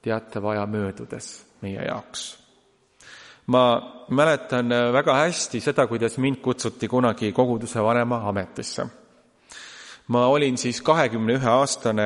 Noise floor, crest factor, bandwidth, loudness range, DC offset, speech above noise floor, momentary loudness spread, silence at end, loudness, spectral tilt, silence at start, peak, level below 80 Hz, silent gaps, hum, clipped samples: -61 dBFS; 20 dB; 11.5 kHz; 5 LU; under 0.1%; 39 dB; 16 LU; 0 s; -23 LUFS; -5 dB/octave; 0.05 s; -4 dBFS; -62 dBFS; none; none; under 0.1%